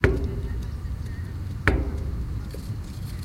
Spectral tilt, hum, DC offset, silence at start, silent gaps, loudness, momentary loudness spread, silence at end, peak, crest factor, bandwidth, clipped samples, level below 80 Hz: -7 dB/octave; none; under 0.1%; 0 s; none; -30 LUFS; 10 LU; 0 s; -2 dBFS; 26 dB; 15.5 kHz; under 0.1%; -30 dBFS